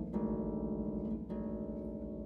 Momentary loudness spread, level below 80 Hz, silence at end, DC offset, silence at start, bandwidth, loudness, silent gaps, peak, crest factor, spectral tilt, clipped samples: 5 LU; -50 dBFS; 0 s; under 0.1%; 0 s; 3.2 kHz; -39 LUFS; none; -24 dBFS; 14 dB; -12 dB/octave; under 0.1%